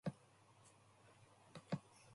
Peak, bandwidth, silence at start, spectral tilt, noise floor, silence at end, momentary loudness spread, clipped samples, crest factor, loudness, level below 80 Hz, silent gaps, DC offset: -30 dBFS; 11.5 kHz; 0.05 s; -6.5 dB/octave; -69 dBFS; 0 s; 19 LU; under 0.1%; 24 dB; -51 LUFS; -80 dBFS; none; under 0.1%